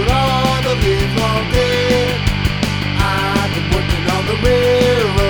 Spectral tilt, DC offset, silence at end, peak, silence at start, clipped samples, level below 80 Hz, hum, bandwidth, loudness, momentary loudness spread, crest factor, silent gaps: -5.5 dB/octave; under 0.1%; 0 s; 0 dBFS; 0 s; under 0.1%; -24 dBFS; none; over 20 kHz; -15 LUFS; 4 LU; 14 dB; none